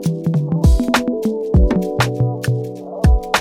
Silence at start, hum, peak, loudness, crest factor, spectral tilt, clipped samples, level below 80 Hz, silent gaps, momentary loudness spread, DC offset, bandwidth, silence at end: 0 s; none; -2 dBFS; -17 LUFS; 14 dB; -6.5 dB/octave; under 0.1%; -20 dBFS; none; 6 LU; under 0.1%; 15.5 kHz; 0 s